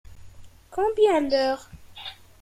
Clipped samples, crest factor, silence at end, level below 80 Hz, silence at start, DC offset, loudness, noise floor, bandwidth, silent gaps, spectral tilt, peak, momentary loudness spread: under 0.1%; 18 dB; 0.3 s; -52 dBFS; 0.1 s; under 0.1%; -23 LUFS; -45 dBFS; 14 kHz; none; -4.5 dB/octave; -8 dBFS; 19 LU